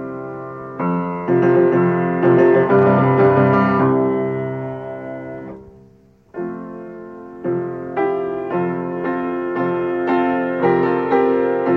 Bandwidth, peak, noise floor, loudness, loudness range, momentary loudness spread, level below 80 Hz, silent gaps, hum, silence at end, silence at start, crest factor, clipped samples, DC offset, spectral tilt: 4.7 kHz; -4 dBFS; -50 dBFS; -17 LUFS; 13 LU; 17 LU; -56 dBFS; none; none; 0 s; 0 s; 14 dB; under 0.1%; under 0.1%; -10 dB/octave